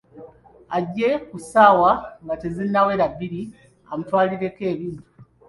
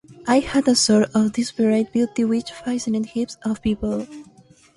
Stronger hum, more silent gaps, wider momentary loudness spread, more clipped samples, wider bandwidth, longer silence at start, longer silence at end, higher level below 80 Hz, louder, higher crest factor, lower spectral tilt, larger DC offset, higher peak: neither; neither; first, 18 LU vs 10 LU; neither; about the same, 11.5 kHz vs 11.5 kHz; about the same, 0.15 s vs 0.1 s; second, 0.25 s vs 0.55 s; second, -54 dBFS vs -48 dBFS; about the same, -20 LUFS vs -21 LUFS; about the same, 20 dB vs 16 dB; first, -6.5 dB/octave vs -4.5 dB/octave; neither; about the same, -2 dBFS vs -4 dBFS